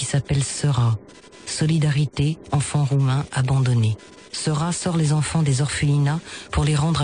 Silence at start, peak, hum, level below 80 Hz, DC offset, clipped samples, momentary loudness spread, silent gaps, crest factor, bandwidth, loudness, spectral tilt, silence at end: 0 s; -8 dBFS; none; -40 dBFS; under 0.1%; under 0.1%; 7 LU; none; 12 dB; 10 kHz; -21 LUFS; -5.5 dB/octave; 0 s